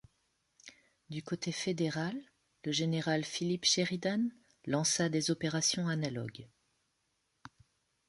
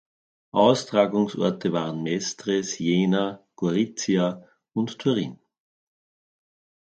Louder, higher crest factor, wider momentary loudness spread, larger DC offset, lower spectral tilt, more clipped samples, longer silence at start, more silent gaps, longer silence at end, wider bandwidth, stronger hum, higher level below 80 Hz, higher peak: second, -33 LUFS vs -24 LUFS; about the same, 20 dB vs 20 dB; first, 15 LU vs 9 LU; neither; second, -3.5 dB/octave vs -5.5 dB/octave; neither; about the same, 0.65 s vs 0.55 s; neither; first, 1.65 s vs 1.5 s; first, 11.5 kHz vs 9 kHz; neither; about the same, -72 dBFS vs -68 dBFS; second, -16 dBFS vs -4 dBFS